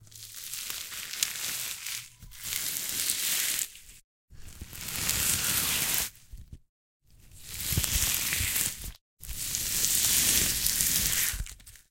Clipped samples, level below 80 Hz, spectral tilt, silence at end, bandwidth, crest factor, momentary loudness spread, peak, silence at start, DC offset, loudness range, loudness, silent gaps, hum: under 0.1%; -46 dBFS; -0.5 dB/octave; 0.1 s; 17 kHz; 30 dB; 17 LU; -2 dBFS; 0 s; under 0.1%; 6 LU; -27 LUFS; 4.04-4.28 s, 6.69-7.00 s, 9.01-9.17 s; none